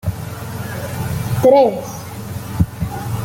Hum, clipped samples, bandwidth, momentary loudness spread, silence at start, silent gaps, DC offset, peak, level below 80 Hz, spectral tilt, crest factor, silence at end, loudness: none; under 0.1%; 17 kHz; 17 LU; 0.05 s; none; under 0.1%; -2 dBFS; -38 dBFS; -6.5 dB/octave; 16 dB; 0 s; -18 LUFS